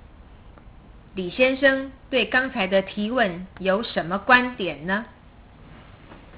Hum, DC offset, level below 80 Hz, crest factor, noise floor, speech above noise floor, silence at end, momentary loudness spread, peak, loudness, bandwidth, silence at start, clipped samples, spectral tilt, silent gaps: none; under 0.1%; -50 dBFS; 22 dB; -48 dBFS; 25 dB; 0 s; 11 LU; -2 dBFS; -22 LUFS; 4 kHz; 0.2 s; under 0.1%; -8.5 dB/octave; none